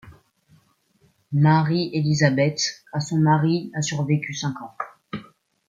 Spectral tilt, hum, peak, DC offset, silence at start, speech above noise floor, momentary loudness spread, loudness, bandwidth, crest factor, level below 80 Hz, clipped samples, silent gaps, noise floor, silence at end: -5.5 dB/octave; none; -4 dBFS; under 0.1%; 0.05 s; 42 dB; 16 LU; -22 LUFS; 7.6 kHz; 20 dB; -62 dBFS; under 0.1%; none; -62 dBFS; 0.45 s